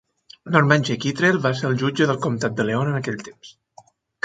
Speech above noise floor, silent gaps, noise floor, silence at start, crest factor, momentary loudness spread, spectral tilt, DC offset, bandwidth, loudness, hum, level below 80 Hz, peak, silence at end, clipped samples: 31 dB; none; -52 dBFS; 0.45 s; 22 dB; 9 LU; -6 dB/octave; under 0.1%; 9.2 kHz; -21 LUFS; none; -60 dBFS; 0 dBFS; 0.75 s; under 0.1%